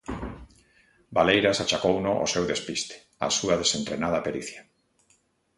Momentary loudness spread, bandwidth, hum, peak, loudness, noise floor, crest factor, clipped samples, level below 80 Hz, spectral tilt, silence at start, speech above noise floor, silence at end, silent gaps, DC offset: 15 LU; 11.5 kHz; none; -6 dBFS; -25 LUFS; -67 dBFS; 22 dB; under 0.1%; -52 dBFS; -3 dB/octave; 0.1 s; 42 dB; 0.95 s; none; under 0.1%